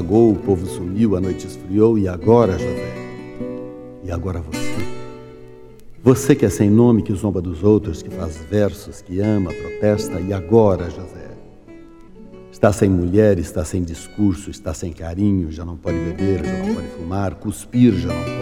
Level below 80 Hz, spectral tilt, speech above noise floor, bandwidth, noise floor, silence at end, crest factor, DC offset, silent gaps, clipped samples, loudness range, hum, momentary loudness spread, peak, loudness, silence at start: -38 dBFS; -7.5 dB/octave; 23 dB; 16 kHz; -41 dBFS; 0 s; 18 dB; under 0.1%; none; under 0.1%; 5 LU; none; 15 LU; 0 dBFS; -19 LUFS; 0 s